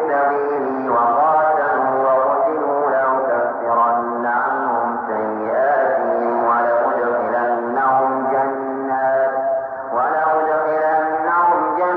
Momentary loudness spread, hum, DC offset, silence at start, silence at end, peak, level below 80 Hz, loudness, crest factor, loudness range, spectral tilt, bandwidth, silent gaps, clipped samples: 5 LU; none; under 0.1%; 0 s; 0 s; -6 dBFS; -66 dBFS; -18 LUFS; 12 dB; 2 LU; -9 dB/octave; 4.5 kHz; none; under 0.1%